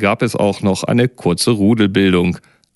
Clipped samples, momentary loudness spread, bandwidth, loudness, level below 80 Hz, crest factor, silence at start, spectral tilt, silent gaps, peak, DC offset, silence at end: under 0.1%; 4 LU; 12 kHz; -15 LUFS; -48 dBFS; 14 dB; 0 s; -5.5 dB/octave; none; 0 dBFS; under 0.1%; 0.35 s